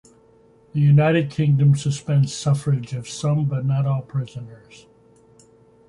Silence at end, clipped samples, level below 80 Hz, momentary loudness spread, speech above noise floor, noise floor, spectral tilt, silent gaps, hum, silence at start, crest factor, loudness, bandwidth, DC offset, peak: 1.35 s; under 0.1%; -56 dBFS; 13 LU; 34 dB; -54 dBFS; -7 dB/octave; none; none; 0.75 s; 14 dB; -20 LUFS; 11 kHz; under 0.1%; -6 dBFS